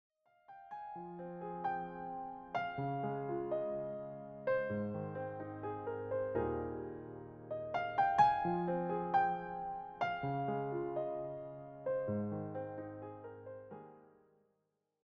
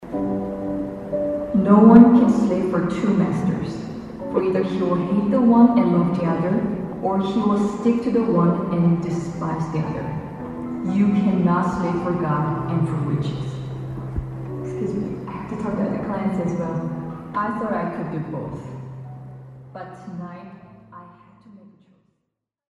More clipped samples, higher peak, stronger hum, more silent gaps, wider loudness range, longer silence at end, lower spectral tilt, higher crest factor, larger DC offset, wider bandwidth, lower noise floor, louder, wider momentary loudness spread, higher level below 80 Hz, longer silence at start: neither; second, -18 dBFS vs 0 dBFS; neither; neither; second, 8 LU vs 15 LU; second, 0.95 s vs 1.65 s; second, -6 dB/octave vs -9 dB/octave; about the same, 22 dB vs 20 dB; neither; second, 7 kHz vs 8 kHz; first, -84 dBFS vs -78 dBFS; second, -39 LUFS vs -21 LUFS; about the same, 16 LU vs 16 LU; second, -66 dBFS vs -46 dBFS; first, 0.5 s vs 0 s